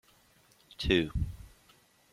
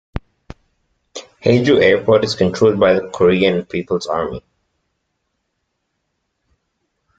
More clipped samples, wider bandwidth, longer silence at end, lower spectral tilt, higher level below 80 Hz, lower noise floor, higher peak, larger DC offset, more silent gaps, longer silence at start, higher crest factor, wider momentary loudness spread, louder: neither; first, 15.5 kHz vs 9 kHz; second, 0.65 s vs 2.8 s; about the same, -6 dB/octave vs -6 dB/octave; about the same, -44 dBFS vs -44 dBFS; second, -64 dBFS vs -72 dBFS; second, -12 dBFS vs -2 dBFS; neither; neither; first, 0.8 s vs 0.15 s; first, 24 dB vs 16 dB; first, 23 LU vs 20 LU; second, -31 LUFS vs -15 LUFS